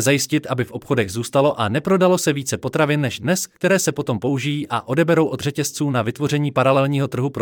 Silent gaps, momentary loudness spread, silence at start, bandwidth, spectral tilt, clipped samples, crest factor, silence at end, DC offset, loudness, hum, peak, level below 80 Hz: none; 6 LU; 0 s; 18.5 kHz; -5 dB/octave; under 0.1%; 14 dB; 0 s; under 0.1%; -20 LUFS; none; -4 dBFS; -60 dBFS